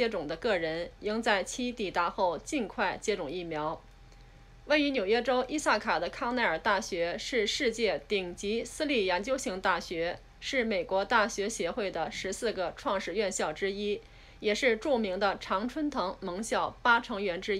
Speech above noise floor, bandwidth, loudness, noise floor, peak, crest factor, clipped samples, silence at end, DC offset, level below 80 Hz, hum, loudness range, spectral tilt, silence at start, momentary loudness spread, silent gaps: 23 dB; 14 kHz; -31 LUFS; -53 dBFS; -12 dBFS; 20 dB; under 0.1%; 0 s; under 0.1%; -54 dBFS; none; 3 LU; -3 dB/octave; 0 s; 7 LU; none